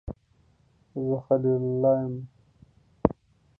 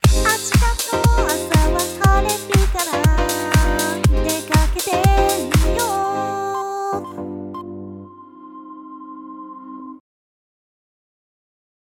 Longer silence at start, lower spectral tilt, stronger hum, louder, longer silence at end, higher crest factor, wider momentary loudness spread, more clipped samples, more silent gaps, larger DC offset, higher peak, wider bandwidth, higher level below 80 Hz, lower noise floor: about the same, 0.05 s vs 0.05 s; first, -12.5 dB/octave vs -4.5 dB/octave; neither; second, -26 LUFS vs -18 LUFS; second, 0.45 s vs 2 s; first, 28 dB vs 18 dB; about the same, 22 LU vs 20 LU; neither; neither; neither; about the same, -2 dBFS vs 0 dBFS; second, 2.9 kHz vs 18.5 kHz; second, -50 dBFS vs -24 dBFS; first, -63 dBFS vs -40 dBFS